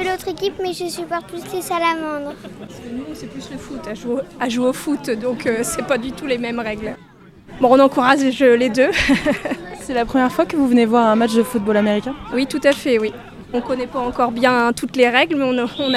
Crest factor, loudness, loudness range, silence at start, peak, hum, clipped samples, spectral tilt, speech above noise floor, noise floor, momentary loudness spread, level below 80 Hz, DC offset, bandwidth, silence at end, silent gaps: 18 dB; -18 LUFS; 9 LU; 0 s; 0 dBFS; none; under 0.1%; -4.5 dB/octave; 22 dB; -40 dBFS; 16 LU; -44 dBFS; under 0.1%; 15 kHz; 0 s; none